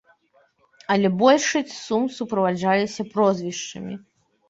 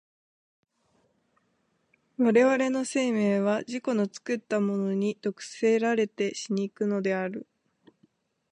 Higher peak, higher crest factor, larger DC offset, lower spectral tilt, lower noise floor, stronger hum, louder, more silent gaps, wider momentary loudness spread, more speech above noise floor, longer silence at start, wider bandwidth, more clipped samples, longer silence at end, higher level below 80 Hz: first, -2 dBFS vs -10 dBFS; about the same, 20 dB vs 18 dB; neither; about the same, -4.5 dB/octave vs -5.5 dB/octave; second, -62 dBFS vs -72 dBFS; neither; first, -22 LUFS vs -27 LUFS; neither; first, 16 LU vs 9 LU; second, 40 dB vs 46 dB; second, 0.9 s vs 2.2 s; second, 8 kHz vs 10.5 kHz; neither; second, 0.5 s vs 1.1 s; first, -66 dBFS vs -80 dBFS